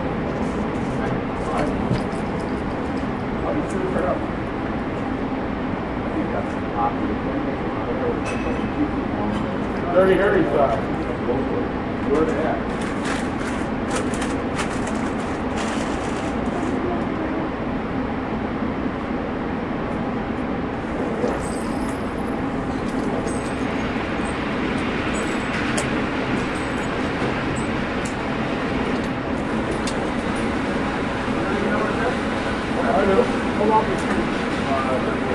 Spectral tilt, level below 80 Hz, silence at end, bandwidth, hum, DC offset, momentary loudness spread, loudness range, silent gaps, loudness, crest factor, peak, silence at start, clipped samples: -6 dB/octave; -38 dBFS; 0 s; 11.5 kHz; none; under 0.1%; 6 LU; 4 LU; none; -23 LUFS; 20 dB; -2 dBFS; 0 s; under 0.1%